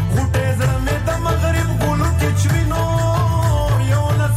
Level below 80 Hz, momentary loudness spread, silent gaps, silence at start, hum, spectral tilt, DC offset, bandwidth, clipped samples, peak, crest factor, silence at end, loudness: -26 dBFS; 2 LU; none; 0 s; none; -6 dB/octave; under 0.1%; 15.5 kHz; under 0.1%; -8 dBFS; 8 dB; 0 s; -17 LUFS